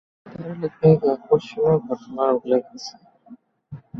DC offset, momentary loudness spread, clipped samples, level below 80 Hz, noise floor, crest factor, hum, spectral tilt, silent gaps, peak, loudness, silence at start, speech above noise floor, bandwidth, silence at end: under 0.1%; 20 LU; under 0.1%; -58 dBFS; -48 dBFS; 20 dB; none; -8 dB/octave; none; -2 dBFS; -21 LUFS; 0.25 s; 28 dB; 7 kHz; 0 s